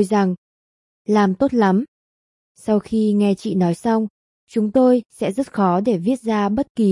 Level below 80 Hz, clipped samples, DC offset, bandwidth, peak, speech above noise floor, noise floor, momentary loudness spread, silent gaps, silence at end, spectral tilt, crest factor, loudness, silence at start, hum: -56 dBFS; under 0.1%; under 0.1%; 11.5 kHz; -4 dBFS; over 72 dB; under -90 dBFS; 9 LU; 0.37-1.05 s, 1.88-2.55 s, 4.10-4.47 s, 6.70-6.75 s; 0 s; -7.5 dB/octave; 14 dB; -19 LUFS; 0 s; none